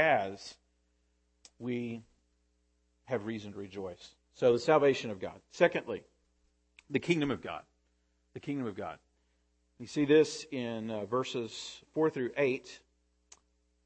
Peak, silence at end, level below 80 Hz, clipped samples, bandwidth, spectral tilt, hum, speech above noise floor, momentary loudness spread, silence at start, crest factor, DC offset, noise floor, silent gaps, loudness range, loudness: -12 dBFS; 1.1 s; -70 dBFS; under 0.1%; 8.8 kHz; -5.5 dB/octave; none; 42 dB; 19 LU; 0 s; 22 dB; under 0.1%; -74 dBFS; none; 10 LU; -32 LUFS